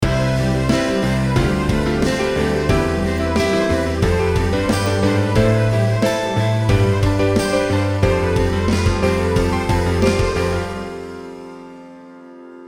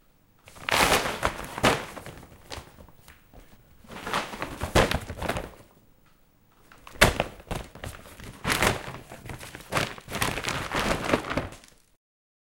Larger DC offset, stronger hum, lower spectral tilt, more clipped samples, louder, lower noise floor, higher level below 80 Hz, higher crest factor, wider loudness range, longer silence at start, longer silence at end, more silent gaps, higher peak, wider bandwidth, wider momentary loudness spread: neither; neither; first, -6 dB/octave vs -3.5 dB/octave; neither; first, -18 LUFS vs -27 LUFS; second, -39 dBFS vs -60 dBFS; first, -30 dBFS vs -42 dBFS; second, 16 dB vs 28 dB; about the same, 2 LU vs 4 LU; second, 0 s vs 0.45 s; second, 0 s vs 0.85 s; neither; about the same, -2 dBFS vs -2 dBFS; first, 19 kHz vs 17 kHz; second, 6 LU vs 20 LU